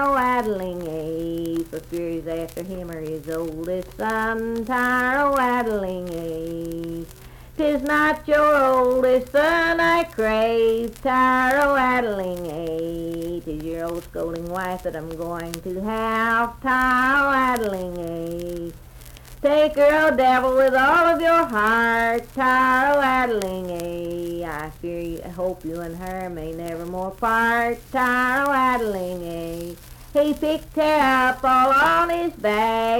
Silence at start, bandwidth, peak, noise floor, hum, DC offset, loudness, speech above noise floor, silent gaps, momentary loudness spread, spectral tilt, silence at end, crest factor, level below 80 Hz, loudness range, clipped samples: 0 s; 19 kHz; -4 dBFS; -42 dBFS; none; under 0.1%; -21 LUFS; 21 dB; none; 14 LU; -5 dB/octave; 0 s; 18 dB; -44 dBFS; 10 LU; under 0.1%